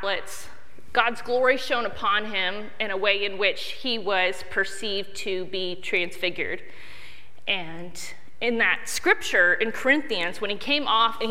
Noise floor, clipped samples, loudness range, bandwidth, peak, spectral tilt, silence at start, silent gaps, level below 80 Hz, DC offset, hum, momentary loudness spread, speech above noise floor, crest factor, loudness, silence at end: -49 dBFS; under 0.1%; 6 LU; 16 kHz; -4 dBFS; -2.5 dB/octave; 0 s; none; -60 dBFS; 3%; none; 15 LU; 23 dB; 22 dB; -24 LUFS; 0 s